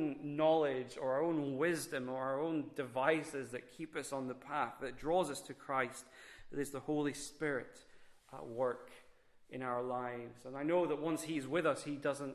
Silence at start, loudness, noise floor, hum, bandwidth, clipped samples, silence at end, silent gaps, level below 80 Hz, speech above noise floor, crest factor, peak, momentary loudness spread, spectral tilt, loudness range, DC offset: 0 s; -38 LUFS; -64 dBFS; none; 13.5 kHz; under 0.1%; 0 s; none; -72 dBFS; 26 dB; 20 dB; -18 dBFS; 13 LU; -5 dB/octave; 5 LU; under 0.1%